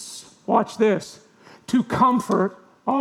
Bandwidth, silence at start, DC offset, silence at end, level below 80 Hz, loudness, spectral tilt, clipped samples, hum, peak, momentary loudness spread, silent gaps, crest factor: 14 kHz; 0 s; under 0.1%; 0 s; -62 dBFS; -22 LUFS; -6 dB/octave; under 0.1%; none; -4 dBFS; 18 LU; none; 18 dB